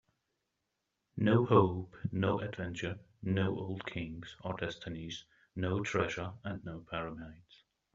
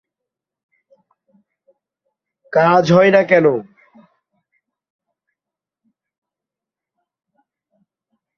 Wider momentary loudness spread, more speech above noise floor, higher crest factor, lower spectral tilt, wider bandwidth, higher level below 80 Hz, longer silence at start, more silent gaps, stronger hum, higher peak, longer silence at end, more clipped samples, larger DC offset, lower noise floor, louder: first, 16 LU vs 8 LU; second, 50 dB vs 75 dB; about the same, 24 dB vs 20 dB; about the same, -6 dB/octave vs -7 dB/octave; about the same, 7.6 kHz vs 7 kHz; about the same, -64 dBFS vs -62 dBFS; second, 1.15 s vs 2.5 s; neither; neither; second, -12 dBFS vs 0 dBFS; second, 0.6 s vs 4.75 s; neither; neither; about the same, -85 dBFS vs -87 dBFS; second, -35 LUFS vs -13 LUFS